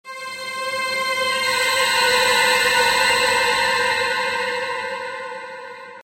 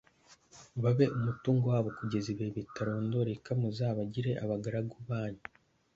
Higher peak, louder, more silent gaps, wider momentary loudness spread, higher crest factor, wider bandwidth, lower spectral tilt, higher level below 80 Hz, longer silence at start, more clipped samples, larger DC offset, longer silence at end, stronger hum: first, -4 dBFS vs -14 dBFS; first, -18 LUFS vs -33 LUFS; neither; first, 15 LU vs 9 LU; about the same, 16 dB vs 20 dB; first, 16 kHz vs 7.6 kHz; second, 0 dB/octave vs -8 dB/octave; first, -56 dBFS vs -64 dBFS; second, 0.05 s vs 0.3 s; neither; neither; second, 0 s vs 0.6 s; neither